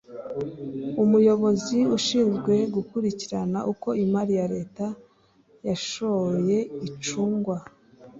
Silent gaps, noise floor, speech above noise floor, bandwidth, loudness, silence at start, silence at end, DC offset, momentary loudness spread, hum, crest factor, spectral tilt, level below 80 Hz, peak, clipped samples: none; -60 dBFS; 36 dB; 7.8 kHz; -25 LUFS; 0.1 s; 0 s; under 0.1%; 13 LU; none; 16 dB; -6 dB/octave; -62 dBFS; -8 dBFS; under 0.1%